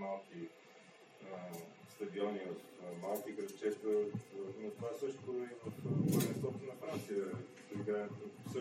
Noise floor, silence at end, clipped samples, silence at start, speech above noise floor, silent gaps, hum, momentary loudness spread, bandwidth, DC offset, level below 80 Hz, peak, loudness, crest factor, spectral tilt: -61 dBFS; 0 s; under 0.1%; 0 s; 20 dB; none; none; 15 LU; 16 kHz; under 0.1%; -82 dBFS; -22 dBFS; -42 LUFS; 20 dB; -6.5 dB/octave